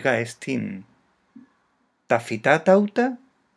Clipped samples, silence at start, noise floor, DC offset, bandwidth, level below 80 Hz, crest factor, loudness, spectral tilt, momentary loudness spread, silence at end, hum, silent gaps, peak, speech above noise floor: under 0.1%; 0 s; -68 dBFS; under 0.1%; 11 kHz; -78 dBFS; 22 dB; -22 LUFS; -6 dB/octave; 16 LU; 0.4 s; none; none; -2 dBFS; 46 dB